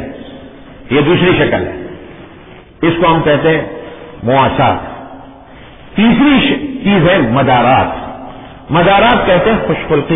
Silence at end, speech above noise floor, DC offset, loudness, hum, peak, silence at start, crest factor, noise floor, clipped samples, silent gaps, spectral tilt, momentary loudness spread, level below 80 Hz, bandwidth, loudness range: 0 s; 26 dB; under 0.1%; -11 LUFS; none; 0 dBFS; 0 s; 12 dB; -36 dBFS; under 0.1%; none; -10 dB/octave; 20 LU; -34 dBFS; 3.9 kHz; 3 LU